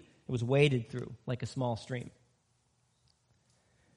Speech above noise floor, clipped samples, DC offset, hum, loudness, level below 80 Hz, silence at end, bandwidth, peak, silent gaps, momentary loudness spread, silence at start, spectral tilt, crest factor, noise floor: 42 dB; under 0.1%; under 0.1%; none; -33 LUFS; -66 dBFS; 1.85 s; 10.5 kHz; -12 dBFS; none; 14 LU; 0.3 s; -6.5 dB/octave; 24 dB; -74 dBFS